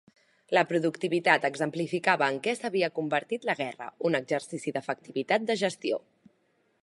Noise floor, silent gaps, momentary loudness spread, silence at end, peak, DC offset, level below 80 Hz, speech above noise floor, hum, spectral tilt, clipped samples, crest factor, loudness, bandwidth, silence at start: -71 dBFS; none; 9 LU; 0.85 s; -6 dBFS; under 0.1%; -82 dBFS; 42 dB; none; -4.5 dB/octave; under 0.1%; 24 dB; -28 LUFS; 11.5 kHz; 0.5 s